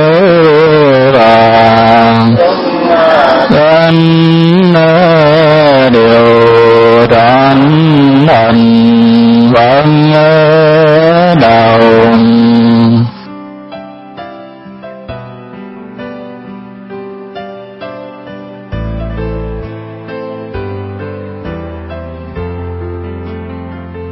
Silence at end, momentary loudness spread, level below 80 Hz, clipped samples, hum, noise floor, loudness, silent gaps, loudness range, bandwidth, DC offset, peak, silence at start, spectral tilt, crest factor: 0 s; 22 LU; -34 dBFS; 1%; none; -29 dBFS; -6 LUFS; none; 21 LU; 6.2 kHz; under 0.1%; 0 dBFS; 0 s; -8.5 dB/octave; 8 dB